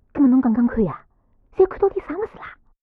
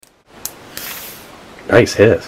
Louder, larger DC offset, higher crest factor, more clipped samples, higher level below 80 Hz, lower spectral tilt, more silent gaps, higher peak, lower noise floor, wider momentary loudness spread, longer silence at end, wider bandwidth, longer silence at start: second, -20 LUFS vs -15 LUFS; neither; about the same, 16 dB vs 16 dB; neither; about the same, -44 dBFS vs -46 dBFS; first, -11.5 dB/octave vs -5 dB/octave; neither; second, -6 dBFS vs 0 dBFS; first, -56 dBFS vs -37 dBFS; about the same, 21 LU vs 22 LU; first, 0.3 s vs 0 s; second, 3.7 kHz vs 16.5 kHz; second, 0.15 s vs 0.45 s